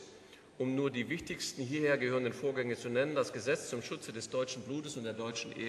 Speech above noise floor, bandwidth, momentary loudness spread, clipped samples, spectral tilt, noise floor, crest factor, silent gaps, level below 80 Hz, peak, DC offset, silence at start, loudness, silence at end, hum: 21 dB; 13 kHz; 9 LU; under 0.1%; -4.5 dB/octave; -57 dBFS; 18 dB; none; -72 dBFS; -18 dBFS; under 0.1%; 0 s; -36 LUFS; 0 s; none